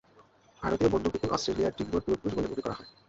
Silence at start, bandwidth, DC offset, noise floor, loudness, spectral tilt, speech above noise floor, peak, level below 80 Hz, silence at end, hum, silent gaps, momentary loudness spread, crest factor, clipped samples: 0.6 s; 8 kHz; under 0.1%; -60 dBFS; -30 LUFS; -6 dB/octave; 30 dB; -12 dBFS; -50 dBFS; 0.2 s; none; none; 8 LU; 20 dB; under 0.1%